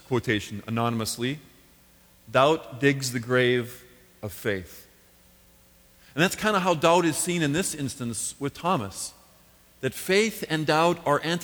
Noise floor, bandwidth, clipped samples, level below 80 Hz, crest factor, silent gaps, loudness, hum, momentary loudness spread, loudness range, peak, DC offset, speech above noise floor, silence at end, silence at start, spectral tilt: -57 dBFS; over 20 kHz; under 0.1%; -58 dBFS; 20 dB; none; -25 LUFS; none; 12 LU; 4 LU; -6 dBFS; under 0.1%; 32 dB; 0 s; 0.1 s; -4.5 dB/octave